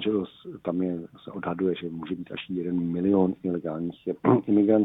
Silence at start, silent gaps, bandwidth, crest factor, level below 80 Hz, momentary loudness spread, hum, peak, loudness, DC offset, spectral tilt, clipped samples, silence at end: 0 s; none; 4 kHz; 20 dB; -62 dBFS; 13 LU; none; -6 dBFS; -27 LUFS; under 0.1%; -10.5 dB/octave; under 0.1%; 0 s